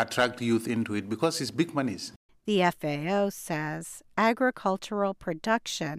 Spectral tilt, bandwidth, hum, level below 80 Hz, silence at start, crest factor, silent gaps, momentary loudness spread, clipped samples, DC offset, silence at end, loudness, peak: -4.5 dB/octave; 15.5 kHz; none; -66 dBFS; 0 s; 18 dB; 2.16-2.29 s; 8 LU; under 0.1%; under 0.1%; 0 s; -29 LUFS; -10 dBFS